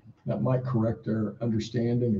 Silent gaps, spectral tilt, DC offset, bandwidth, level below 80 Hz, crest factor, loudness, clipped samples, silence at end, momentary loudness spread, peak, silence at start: none; -8.5 dB/octave; under 0.1%; 7.4 kHz; -58 dBFS; 14 dB; -29 LUFS; under 0.1%; 0 s; 4 LU; -14 dBFS; 0.05 s